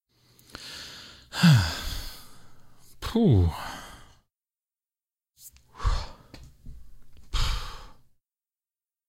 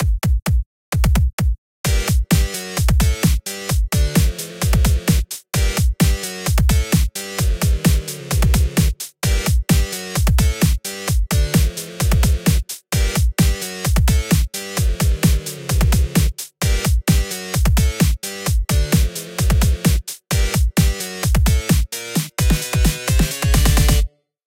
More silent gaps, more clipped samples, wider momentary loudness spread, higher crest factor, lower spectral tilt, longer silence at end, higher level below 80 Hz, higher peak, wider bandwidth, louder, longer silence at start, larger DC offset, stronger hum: second, none vs 0.66-0.92 s, 1.33-1.38 s, 1.58-1.84 s; neither; first, 27 LU vs 6 LU; first, 22 dB vs 14 dB; first, -6 dB/octave vs -4.5 dB/octave; first, 1.15 s vs 0.4 s; second, -38 dBFS vs -20 dBFS; second, -8 dBFS vs -2 dBFS; about the same, 16 kHz vs 17 kHz; second, -26 LUFS vs -19 LUFS; first, 0.55 s vs 0 s; neither; neither